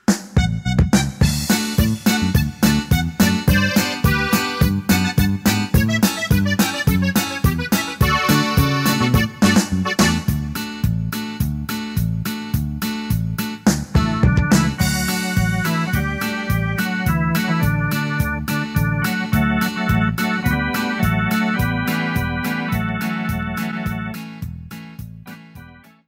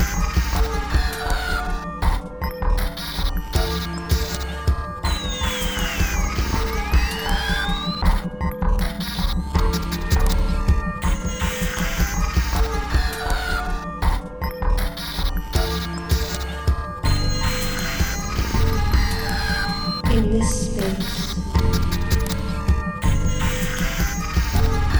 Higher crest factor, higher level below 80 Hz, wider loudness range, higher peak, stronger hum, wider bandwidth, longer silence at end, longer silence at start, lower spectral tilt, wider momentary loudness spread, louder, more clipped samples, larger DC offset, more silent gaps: about the same, 16 dB vs 16 dB; second, -30 dBFS vs -22 dBFS; about the same, 5 LU vs 3 LU; about the same, -4 dBFS vs -4 dBFS; neither; second, 16.5 kHz vs over 20 kHz; first, 0.35 s vs 0 s; about the same, 0.1 s vs 0 s; about the same, -5 dB/octave vs -4.5 dB/octave; first, 8 LU vs 4 LU; first, -19 LUFS vs -23 LUFS; neither; neither; neither